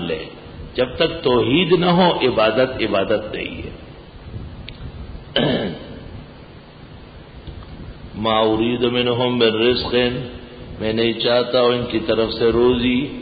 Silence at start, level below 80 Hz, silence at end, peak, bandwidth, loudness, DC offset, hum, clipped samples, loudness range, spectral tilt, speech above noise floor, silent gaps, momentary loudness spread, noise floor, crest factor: 0 s; -40 dBFS; 0 s; -4 dBFS; 5 kHz; -18 LUFS; under 0.1%; none; under 0.1%; 9 LU; -11 dB/octave; 22 dB; none; 21 LU; -40 dBFS; 16 dB